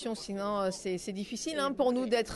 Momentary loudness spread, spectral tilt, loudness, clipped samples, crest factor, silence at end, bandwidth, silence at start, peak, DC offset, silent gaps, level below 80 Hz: 8 LU; -4 dB/octave; -32 LUFS; under 0.1%; 16 dB; 0 s; 12.5 kHz; 0 s; -16 dBFS; under 0.1%; none; -60 dBFS